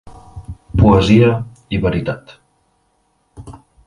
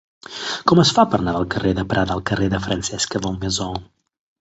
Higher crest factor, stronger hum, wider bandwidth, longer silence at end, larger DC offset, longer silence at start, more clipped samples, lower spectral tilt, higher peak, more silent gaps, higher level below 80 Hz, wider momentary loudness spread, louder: about the same, 16 dB vs 18 dB; neither; first, 11 kHz vs 8.2 kHz; second, 0.3 s vs 0.55 s; neither; second, 0.05 s vs 0.3 s; neither; first, -8 dB/octave vs -4.5 dB/octave; about the same, 0 dBFS vs -2 dBFS; neither; first, -30 dBFS vs -40 dBFS; first, 24 LU vs 12 LU; first, -14 LUFS vs -20 LUFS